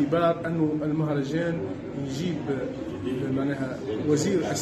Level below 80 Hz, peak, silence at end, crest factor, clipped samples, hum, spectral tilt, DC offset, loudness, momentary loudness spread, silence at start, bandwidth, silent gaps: -54 dBFS; -12 dBFS; 0 s; 16 dB; under 0.1%; none; -6.5 dB/octave; under 0.1%; -27 LUFS; 8 LU; 0 s; 13 kHz; none